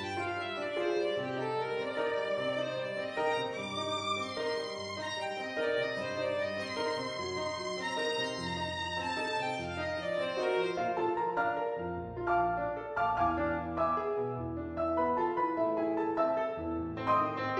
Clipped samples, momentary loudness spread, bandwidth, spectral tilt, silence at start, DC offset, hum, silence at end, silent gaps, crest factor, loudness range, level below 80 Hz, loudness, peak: under 0.1%; 5 LU; 10 kHz; -5 dB/octave; 0 s; under 0.1%; none; 0 s; none; 16 dB; 2 LU; -58 dBFS; -33 LUFS; -18 dBFS